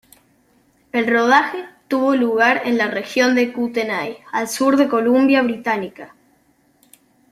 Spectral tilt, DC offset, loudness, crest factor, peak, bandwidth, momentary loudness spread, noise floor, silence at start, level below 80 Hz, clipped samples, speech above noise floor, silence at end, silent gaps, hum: -4 dB/octave; under 0.1%; -17 LUFS; 18 dB; -2 dBFS; 15 kHz; 10 LU; -59 dBFS; 0.95 s; -64 dBFS; under 0.1%; 41 dB; 1.25 s; none; none